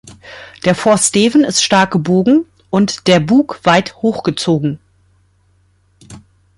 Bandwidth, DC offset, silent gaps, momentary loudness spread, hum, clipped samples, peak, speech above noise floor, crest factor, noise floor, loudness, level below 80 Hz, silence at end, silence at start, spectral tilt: 11.5 kHz; under 0.1%; none; 9 LU; none; under 0.1%; 0 dBFS; 43 dB; 14 dB; -55 dBFS; -13 LUFS; -52 dBFS; 0.4 s; 0.05 s; -4.5 dB/octave